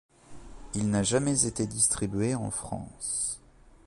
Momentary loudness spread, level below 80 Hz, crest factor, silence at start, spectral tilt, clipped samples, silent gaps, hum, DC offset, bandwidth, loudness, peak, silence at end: 11 LU; -50 dBFS; 22 dB; 0.3 s; -4 dB/octave; under 0.1%; none; none; under 0.1%; 11.5 kHz; -28 LUFS; -8 dBFS; 0.5 s